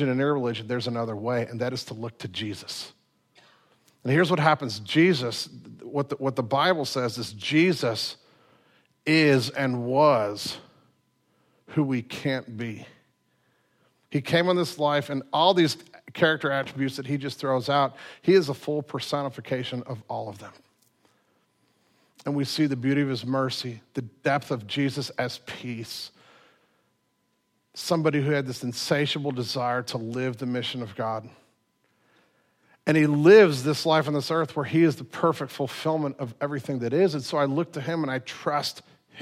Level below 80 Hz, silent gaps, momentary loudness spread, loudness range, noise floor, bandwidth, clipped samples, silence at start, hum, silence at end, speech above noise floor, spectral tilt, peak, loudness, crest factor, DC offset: -72 dBFS; none; 14 LU; 10 LU; -72 dBFS; 15.5 kHz; under 0.1%; 0 s; none; 0 s; 47 dB; -5.5 dB/octave; -4 dBFS; -25 LUFS; 22 dB; under 0.1%